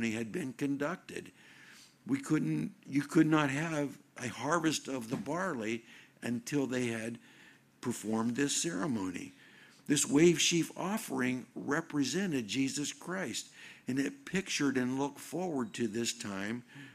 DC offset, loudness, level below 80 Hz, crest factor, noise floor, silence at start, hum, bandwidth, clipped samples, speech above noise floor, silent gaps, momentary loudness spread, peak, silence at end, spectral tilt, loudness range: under 0.1%; -34 LUFS; -74 dBFS; 22 dB; -60 dBFS; 0 s; none; 15 kHz; under 0.1%; 27 dB; none; 13 LU; -14 dBFS; 0 s; -4 dB/octave; 5 LU